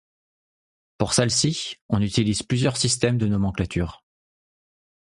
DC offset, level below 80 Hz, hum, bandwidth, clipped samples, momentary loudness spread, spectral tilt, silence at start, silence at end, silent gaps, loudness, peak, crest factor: under 0.1%; -44 dBFS; none; 11.5 kHz; under 0.1%; 8 LU; -4.5 dB/octave; 1 s; 1.15 s; 1.82-1.89 s; -23 LUFS; -4 dBFS; 20 dB